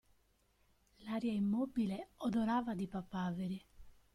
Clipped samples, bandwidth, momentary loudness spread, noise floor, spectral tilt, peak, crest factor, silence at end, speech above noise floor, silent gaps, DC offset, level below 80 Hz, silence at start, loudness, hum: under 0.1%; 12.5 kHz; 8 LU; -74 dBFS; -7.5 dB/octave; -24 dBFS; 14 dB; 0.25 s; 37 dB; none; under 0.1%; -66 dBFS; 1 s; -39 LUFS; none